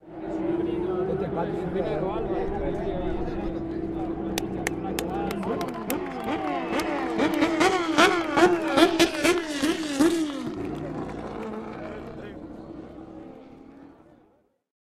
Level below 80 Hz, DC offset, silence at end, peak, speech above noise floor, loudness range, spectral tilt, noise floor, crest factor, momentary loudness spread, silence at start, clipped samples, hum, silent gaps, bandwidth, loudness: -44 dBFS; under 0.1%; 0.85 s; -2 dBFS; 36 dB; 15 LU; -4.5 dB/octave; -64 dBFS; 24 dB; 18 LU; 0.05 s; under 0.1%; none; none; 16 kHz; -26 LUFS